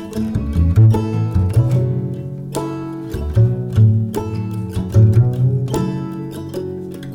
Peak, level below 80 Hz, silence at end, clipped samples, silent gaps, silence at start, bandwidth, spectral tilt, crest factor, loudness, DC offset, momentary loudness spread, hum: -2 dBFS; -30 dBFS; 0 s; under 0.1%; none; 0 s; 16 kHz; -8.5 dB/octave; 14 dB; -18 LUFS; under 0.1%; 14 LU; none